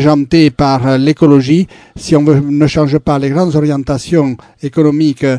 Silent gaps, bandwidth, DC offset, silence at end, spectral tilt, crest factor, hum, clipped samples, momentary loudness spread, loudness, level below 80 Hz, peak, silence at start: none; 10.5 kHz; under 0.1%; 0 s; -7.5 dB/octave; 10 dB; none; 0.6%; 8 LU; -11 LUFS; -38 dBFS; 0 dBFS; 0 s